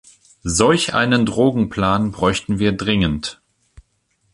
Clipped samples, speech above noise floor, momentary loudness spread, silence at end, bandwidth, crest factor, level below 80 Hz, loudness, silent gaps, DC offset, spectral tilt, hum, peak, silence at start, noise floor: under 0.1%; 48 dB; 7 LU; 1 s; 11.5 kHz; 18 dB; -38 dBFS; -18 LUFS; none; under 0.1%; -4.5 dB/octave; none; 0 dBFS; 0.45 s; -65 dBFS